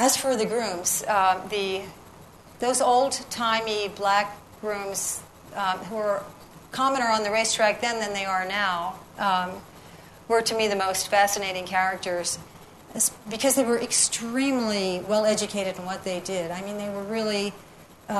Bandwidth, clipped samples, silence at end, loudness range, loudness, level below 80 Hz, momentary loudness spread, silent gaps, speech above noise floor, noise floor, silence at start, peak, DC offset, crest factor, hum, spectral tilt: 13.5 kHz; under 0.1%; 0 s; 3 LU; -25 LUFS; -60 dBFS; 11 LU; none; 23 dB; -48 dBFS; 0 s; -6 dBFS; under 0.1%; 20 dB; none; -2 dB/octave